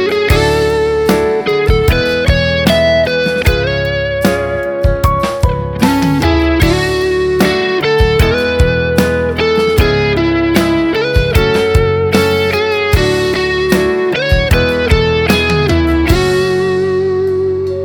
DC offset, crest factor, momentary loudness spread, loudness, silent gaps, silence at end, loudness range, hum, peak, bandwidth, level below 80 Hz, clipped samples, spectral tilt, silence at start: under 0.1%; 12 dB; 3 LU; -12 LUFS; none; 0 s; 1 LU; none; 0 dBFS; over 20 kHz; -20 dBFS; under 0.1%; -6 dB/octave; 0 s